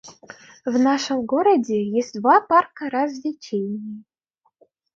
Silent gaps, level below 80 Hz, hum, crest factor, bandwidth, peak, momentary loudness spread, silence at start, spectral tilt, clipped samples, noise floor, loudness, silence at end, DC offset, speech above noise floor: none; -68 dBFS; none; 18 dB; 7.6 kHz; -4 dBFS; 15 LU; 0.05 s; -5 dB/octave; under 0.1%; -70 dBFS; -21 LUFS; 0.95 s; under 0.1%; 49 dB